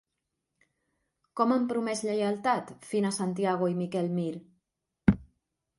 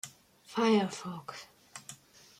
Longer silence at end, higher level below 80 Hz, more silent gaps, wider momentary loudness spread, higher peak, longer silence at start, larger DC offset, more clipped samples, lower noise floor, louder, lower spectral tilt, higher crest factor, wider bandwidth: about the same, 0.55 s vs 0.45 s; first, -52 dBFS vs -78 dBFS; neither; second, 7 LU vs 22 LU; first, -6 dBFS vs -16 dBFS; first, 1.35 s vs 0.05 s; neither; neither; first, -84 dBFS vs -54 dBFS; about the same, -29 LUFS vs -31 LUFS; about the same, -6 dB/octave vs -5 dB/octave; first, 24 dB vs 18 dB; second, 11.5 kHz vs 15.5 kHz